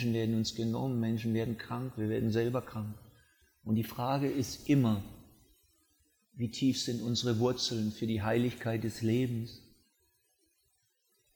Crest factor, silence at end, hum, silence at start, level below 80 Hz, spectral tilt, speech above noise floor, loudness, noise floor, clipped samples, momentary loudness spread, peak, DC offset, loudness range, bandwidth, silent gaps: 16 dB; 1.75 s; none; 0 s; -64 dBFS; -6 dB/octave; 43 dB; -33 LUFS; -75 dBFS; under 0.1%; 10 LU; -18 dBFS; under 0.1%; 3 LU; over 20 kHz; none